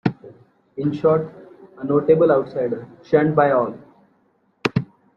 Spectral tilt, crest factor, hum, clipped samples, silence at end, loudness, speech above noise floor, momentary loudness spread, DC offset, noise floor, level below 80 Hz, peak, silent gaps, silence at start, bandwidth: -8.5 dB/octave; 18 dB; none; under 0.1%; 0.3 s; -20 LUFS; 44 dB; 14 LU; under 0.1%; -63 dBFS; -58 dBFS; -2 dBFS; none; 0.05 s; 7 kHz